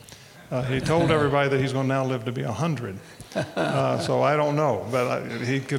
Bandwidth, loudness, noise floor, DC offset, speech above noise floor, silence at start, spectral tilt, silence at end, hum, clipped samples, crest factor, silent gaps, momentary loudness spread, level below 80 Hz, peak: 16 kHz; -24 LUFS; -46 dBFS; under 0.1%; 22 dB; 0.1 s; -6.5 dB/octave; 0 s; none; under 0.1%; 18 dB; none; 10 LU; -54 dBFS; -6 dBFS